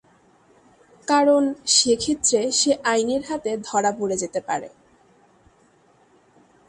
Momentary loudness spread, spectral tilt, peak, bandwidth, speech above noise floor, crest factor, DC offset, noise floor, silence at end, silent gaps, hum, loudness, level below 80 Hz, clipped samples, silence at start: 10 LU; -2 dB/octave; -4 dBFS; 11.5 kHz; 37 dB; 18 dB; under 0.1%; -58 dBFS; 2 s; none; none; -20 LUFS; -60 dBFS; under 0.1%; 1.1 s